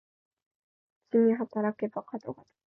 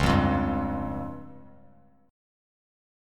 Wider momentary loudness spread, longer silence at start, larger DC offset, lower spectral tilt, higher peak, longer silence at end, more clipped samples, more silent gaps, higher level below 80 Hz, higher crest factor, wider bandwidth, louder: second, 17 LU vs 20 LU; first, 1.15 s vs 0 s; neither; first, -10.5 dB/octave vs -7 dB/octave; second, -14 dBFS vs -8 dBFS; second, 0.4 s vs 1 s; neither; neither; second, -80 dBFS vs -40 dBFS; about the same, 18 dB vs 20 dB; second, 5.6 kHz vs 15 kHz; about the same, -29 LUFS vs -28 LUFS